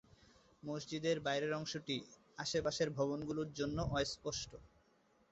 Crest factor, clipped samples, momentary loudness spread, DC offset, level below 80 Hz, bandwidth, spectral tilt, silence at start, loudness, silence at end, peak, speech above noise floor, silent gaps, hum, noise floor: 18 dB; under 0.1%; 9 LU; under 0.1%; -60 dBFS; 8 kHz; -4 dB/octave; 0.65 s; -40 LUFS; 0.65 s; -22 dBFS; 33 dB; none; none; -73 dBFS